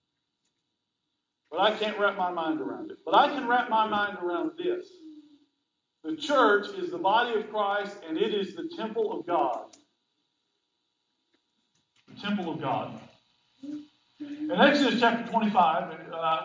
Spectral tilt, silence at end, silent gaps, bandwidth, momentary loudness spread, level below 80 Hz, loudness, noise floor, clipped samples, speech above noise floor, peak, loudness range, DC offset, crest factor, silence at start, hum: -5.5 dB/octave; 0 s; none; 7.6 kHz; 16 LU; -76 dBFS; -27 LUFS; -82 dBFS; under 0.1%; 55 dB; -8 dBFS; 11 LU; under 0.1%; 22 dB; 1.5 s; none